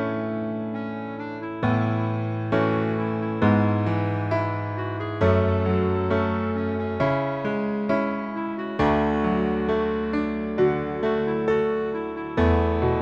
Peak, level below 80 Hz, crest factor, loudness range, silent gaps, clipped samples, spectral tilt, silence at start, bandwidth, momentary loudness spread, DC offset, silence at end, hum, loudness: -6 dBFS; -40 dBFS; 16 dB; 1 LU; none; under 0.1%; -9 dB/octave; 0 s; 7.2 kHz; 8 LU; under 0.1%; 0 s; none; -24 LUFS